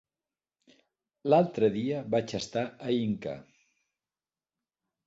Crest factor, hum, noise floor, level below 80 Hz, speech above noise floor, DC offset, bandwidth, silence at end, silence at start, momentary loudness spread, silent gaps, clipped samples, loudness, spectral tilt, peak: 22 dB; none; under -90 dBFS; -68 dBFS; over 62 dB; under 0.1%; 8 kHz; 1.65 s; 1.25 s; 12 LU; none; under 0.1%; -29 LUFS; -6.5 dB/octave; -10 dBFS